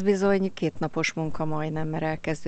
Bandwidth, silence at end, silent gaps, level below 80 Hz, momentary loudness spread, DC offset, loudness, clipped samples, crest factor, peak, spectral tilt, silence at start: 8.8 kHz; 0 s; none; -50 dBFS; 7 LU; under 0.1%; -27 LUFS; under 0.1%; 14 dB; -10 dBFS; -6 dB/octave; 0 s